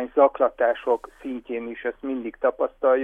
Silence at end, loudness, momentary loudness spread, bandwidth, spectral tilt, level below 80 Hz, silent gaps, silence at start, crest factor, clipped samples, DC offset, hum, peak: 0 s; -24 LUFS; 12 LU; 3.7 kHz; -6 dB/octave; -58 dBFS; none; 0 s; 18 dB; under 0.1%; under 0.1%; none; -6 dBFS